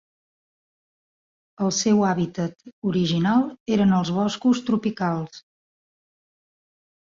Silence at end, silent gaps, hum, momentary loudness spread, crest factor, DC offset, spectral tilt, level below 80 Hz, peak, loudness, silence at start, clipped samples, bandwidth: 1.6 s; 2.73-2.82 s, 3.60-3.66 s; none; 10 LU; 16 dB; under 0.1%; -5.5 dB/octave; -60 dBFS; -8 dBFS; -23 LUFS; 1.6 s; under 0.1%; 7.6 kHz